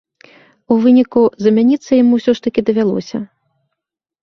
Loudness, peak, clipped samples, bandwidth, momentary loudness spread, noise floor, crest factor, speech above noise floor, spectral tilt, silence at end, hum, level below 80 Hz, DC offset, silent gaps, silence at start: -13 LUFS; -2 dBFS; under 0.1%; 6.4 kHz; 12 LU; -79 dBFS; 12 dB; 66 dB; -7 dB/octave; 0.95 s; none; -56 dBFS; under 0.1%; none; 0.7 s